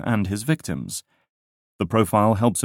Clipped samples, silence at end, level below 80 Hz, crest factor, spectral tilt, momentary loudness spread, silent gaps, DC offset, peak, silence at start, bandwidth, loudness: under 0.1%; 0 s; -52 dBFS; 18 dB; -5.5 dB/octave; 12 LU; 1.29-1.79 s; under 0.1%; -4 dBFS; 0 s; 17 kHz; -22 LUFS